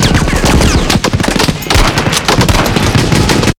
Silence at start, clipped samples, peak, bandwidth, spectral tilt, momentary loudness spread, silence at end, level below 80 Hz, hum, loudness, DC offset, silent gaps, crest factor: 0 s; 1%; 0 dBFS; 19.5 kHz; -4.5 dB/octave; 2 LU; 0.05 s; -16 dBFS; none; -10 LUFS; under 0.1%; none; 10 dB